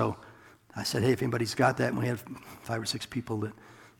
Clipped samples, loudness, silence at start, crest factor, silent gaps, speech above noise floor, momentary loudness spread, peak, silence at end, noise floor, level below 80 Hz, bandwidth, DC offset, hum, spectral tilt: under 0.1%; -30 LUFS; 0 s; 22 dB; none; 24 dB; 17 LU; -10 dBFS; 0.15 s; -54 dBFS; -62 dBFS; 18 kHz; under 0.1%; none; -5 dB/octave